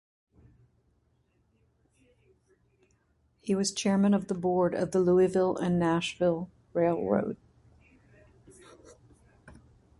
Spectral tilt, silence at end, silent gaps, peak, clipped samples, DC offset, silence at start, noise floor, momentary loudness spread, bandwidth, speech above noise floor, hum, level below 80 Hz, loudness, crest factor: -6 dB/octave; 0.5 s; none; -12 dBFS; under 0.1%; under 0.1%; 3.45 s; -70 dBFS; 11 LU; 11.5 kHz; 44 dB; none; -62 dBFS; -28 LUFS; 20 dB